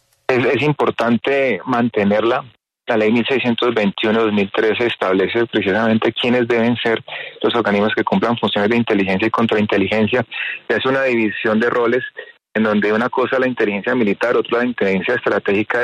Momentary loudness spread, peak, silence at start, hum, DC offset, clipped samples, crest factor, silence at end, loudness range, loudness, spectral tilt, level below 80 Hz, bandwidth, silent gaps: 4 LU; -4 dBFS; 0.3 s; none; under 0.1%; under 0.1%; 12 dB; 0 s; 1 LU; -17 LUFS; -7 dB/octave; -58 dBFS; 8.8 kHz; none